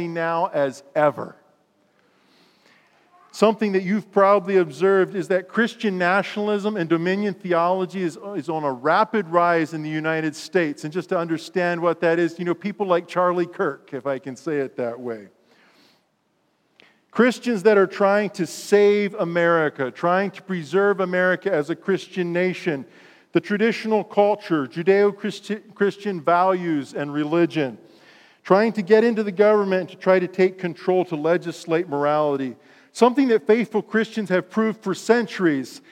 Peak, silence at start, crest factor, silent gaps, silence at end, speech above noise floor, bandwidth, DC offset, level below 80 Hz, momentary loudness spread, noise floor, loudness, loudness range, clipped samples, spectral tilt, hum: -2 dBFS; 0 s; 20 dB; none; 0.15 s; 47 dB; 14 kHz; under 0.1%; -82 dBFS; 10 LU; -67 dBFS; -21 LUFS; 5 LU; under 0.1%; -6 dB/octave; none